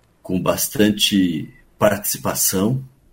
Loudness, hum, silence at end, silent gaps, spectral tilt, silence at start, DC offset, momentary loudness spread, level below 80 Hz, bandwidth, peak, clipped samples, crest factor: -19 LUFS; none; 0.25 s; none; -4 dB/octave; 0.25 s; under 0.1%; 10 LU; -50 dBFS; 16.5 kHz; 0 dBFS; under 0.1%; 20 dB